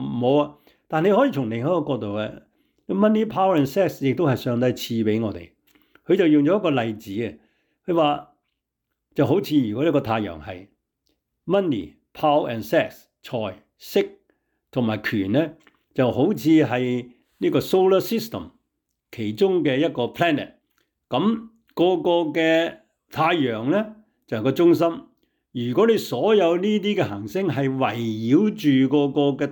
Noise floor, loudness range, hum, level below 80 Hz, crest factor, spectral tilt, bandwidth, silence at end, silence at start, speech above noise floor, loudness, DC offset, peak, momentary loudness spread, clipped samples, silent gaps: -80 dBFS; 4 LU; none; -62 dBFS; 14 dB; -7 dB/octave; 19.5 kHz; 0 s; 0 s; 59 dB; -22 LUFS; under 0.1%; -8 dBFS; 13 LU; under 0.1%; none